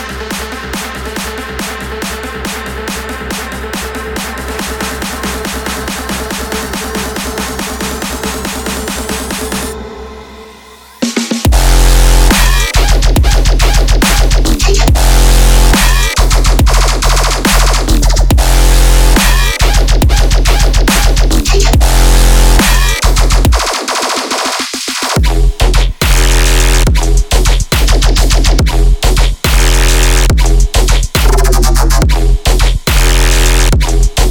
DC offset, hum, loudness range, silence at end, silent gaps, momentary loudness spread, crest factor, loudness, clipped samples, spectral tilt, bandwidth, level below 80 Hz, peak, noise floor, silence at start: under 0.1%; none; 9 LU; 0 s; none; 10 LU; 8 dB; -11 LUFS; under 0.1%; -3.5 dB/octave; 18.5 kHz; -10 dBFS; 0 dBFS; -35 dBFS; 0 s